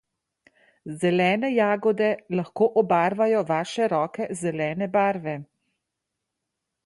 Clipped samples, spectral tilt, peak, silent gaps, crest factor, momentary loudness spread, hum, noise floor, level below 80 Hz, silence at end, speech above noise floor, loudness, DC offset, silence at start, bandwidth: under 0.1%; -6 dB/octave; -8 dBFS; none; 16 dB; 9 LU; none; -83 dBFS; -70 dBFS; 1.4 s; 60 dB; -24 LUFS; under 0.1%; 0.85 s; 11.5 kHz